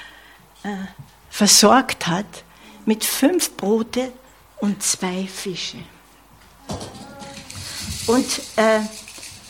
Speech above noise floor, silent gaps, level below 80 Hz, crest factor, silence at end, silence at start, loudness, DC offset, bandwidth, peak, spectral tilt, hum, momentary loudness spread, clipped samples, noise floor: 30 dB; none; -52 dBFS; 22 dB; 0 s; 0 s; -19 LUFS; under 0.1%; 17.5 kHz; 0 dBFS; -3 dB/octave; none; 21 LU; under 0.1%; -49 dBFS